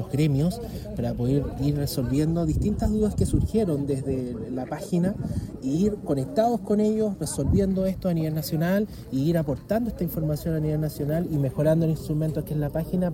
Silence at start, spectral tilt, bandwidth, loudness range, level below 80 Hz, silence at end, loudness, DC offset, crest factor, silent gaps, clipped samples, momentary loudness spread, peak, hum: 0 s; -7.5 dB/octave; 17 kHz; 2 LU; -38 dBFS; 0 s; -26 LUFS; under 0.1%; 16 dB; none; under 0.1%; 6 LU; -10 dBFS; none